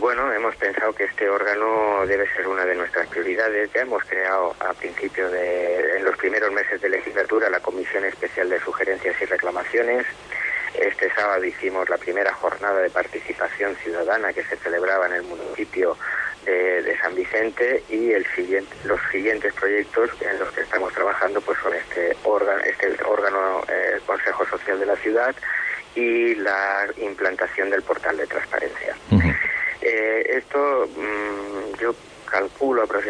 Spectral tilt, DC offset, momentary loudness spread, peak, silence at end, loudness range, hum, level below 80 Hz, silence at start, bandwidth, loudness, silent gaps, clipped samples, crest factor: -6 dB/octave; under 0.1%; 5 LU; -6 dBFS; 0 s; 1 LU; 50 Hz at -55 dBFS; -48 dBFS; 0 s; 10.5 kHz; -22 LUFS; none; under 0.1%; 18 dB